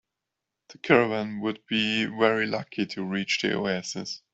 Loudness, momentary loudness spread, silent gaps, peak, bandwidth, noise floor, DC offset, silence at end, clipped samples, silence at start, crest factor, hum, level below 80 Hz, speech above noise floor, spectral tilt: -26 LUFS; 10 LU; none; -4 dBFS; 8.2 kHz; -85 dBFS; under 0.1%; 0.15 s; under 0.1%; 0.7 s; 24 dB; none; -66 dBFS; 59 dB; -4.5 dB/octave